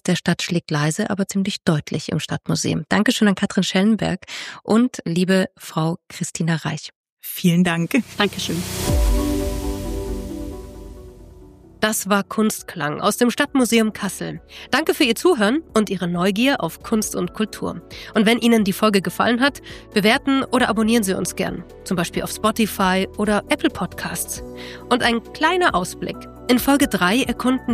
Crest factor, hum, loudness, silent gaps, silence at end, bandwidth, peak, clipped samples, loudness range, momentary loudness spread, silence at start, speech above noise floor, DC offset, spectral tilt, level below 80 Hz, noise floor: 18 dB; none; -20 LUFS; 6.95-7.04 s, 7.12-7.17 s; 0 s; 15.5 kHz; -4 dBFS; under 0.1%; 4 LU; 12 LU; 0.05 s; 24 dB; under 0.1%; -4.5 dB/octave; -36 dBFS; -44 dBFS